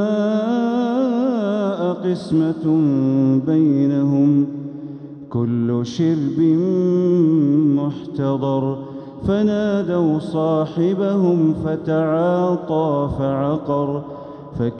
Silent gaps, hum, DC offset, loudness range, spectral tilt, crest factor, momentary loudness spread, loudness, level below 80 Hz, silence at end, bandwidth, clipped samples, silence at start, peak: none; none; under 0.1%; 2 LU; -9 dB/octave; 12 dB; 9 LU; -19 LUFS; -50 dBFS; 0 s; 8.6 kHz; under 0.1%; 0 s; -6 dBFS